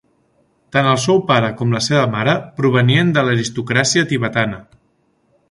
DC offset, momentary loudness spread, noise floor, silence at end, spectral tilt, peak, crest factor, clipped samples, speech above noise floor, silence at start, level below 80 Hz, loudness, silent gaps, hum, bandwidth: under 0.1%; 6 LU; -61 dBFS; 0.9 s; -5 dB/octave; 0 dBFS; 16 dB; under 0.1%; 46 dB; 0.75 s; -52 dBFS; -16 LUFS; none; none; 11.5 kHz